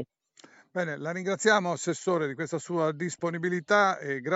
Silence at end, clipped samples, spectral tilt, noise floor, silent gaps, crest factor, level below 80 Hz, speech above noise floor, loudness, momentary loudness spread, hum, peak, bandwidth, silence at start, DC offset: 0 s; under 0.1%; -4 dB/octave; -58 dBFS; none; 20 dB; -80 dBFS; 30 dB; -28 LUFS; 9 LU; none; -8 dBFS; 8 kHz; 0 s; under 0.1%